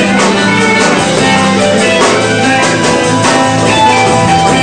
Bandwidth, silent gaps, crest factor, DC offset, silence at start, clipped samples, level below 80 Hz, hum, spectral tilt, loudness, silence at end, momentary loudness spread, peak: 11 kHz; none; 8 dB; 0.3%; 0 s; 0.3%; -38 dBFS; none; -4 dB/octave; -8 LUFS; 0 s; 2 LU; 0 dBFS